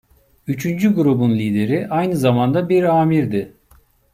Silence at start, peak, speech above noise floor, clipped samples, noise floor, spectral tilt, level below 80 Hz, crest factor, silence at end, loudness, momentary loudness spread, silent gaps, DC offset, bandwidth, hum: 0.45 s; -4 dBFS; 37 dB; under 0.1%; -53 dBFS; -8 dB/octave; -54 dBFS; 14 dB; 0.65 s; -17 LUFS; 9 LU; none; under 0.1%; 16 kHz; none